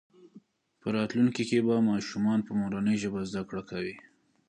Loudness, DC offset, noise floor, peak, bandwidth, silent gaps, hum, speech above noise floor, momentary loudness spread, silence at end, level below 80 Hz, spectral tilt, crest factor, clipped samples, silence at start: -29 LUFS; under 0.1%; -58 dBFS; -14 dBFS; 9.8 kHz; none; none; 29 dB; 11 LU; 0.5 s; -64 dBFS; -6.5 dB/octave; 16 dB; under 0.1%; 0.25 s